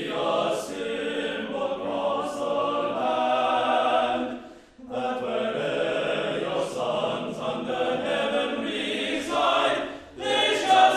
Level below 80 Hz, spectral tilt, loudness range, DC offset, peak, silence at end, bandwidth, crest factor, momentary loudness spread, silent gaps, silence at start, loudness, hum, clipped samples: -62 dBFS; -3.5 dB/octave; 2 LU; under 0.1%; -6 dBFS; 0 s; 13.5 kHz; 20 dB; 8 LU; none; 0 s; -26 LUFS; none; under 0.1%